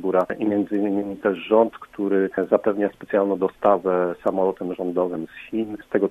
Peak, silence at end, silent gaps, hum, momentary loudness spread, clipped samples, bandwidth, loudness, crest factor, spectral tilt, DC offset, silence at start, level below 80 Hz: -2 dBFS; 0 s; none; none; 9 LU; under 0.1%; 13.5 kHz; -23 LUFS; 20 dB; -8.5 dB/octave; under 0.1%; 0 s; -62 dBFS